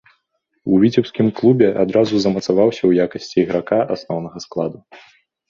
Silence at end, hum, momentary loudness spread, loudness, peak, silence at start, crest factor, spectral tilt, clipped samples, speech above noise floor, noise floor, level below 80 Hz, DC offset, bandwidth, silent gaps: 0.55 s; none; 11 LU; -17 LUFS; -2 dBFS; 0.65 s; 16 dB; -7 dB/octave; under 0.1%; 53 dB; -69 dBFS; -54 dBFS; under 0.1%; 7.4 kHz; none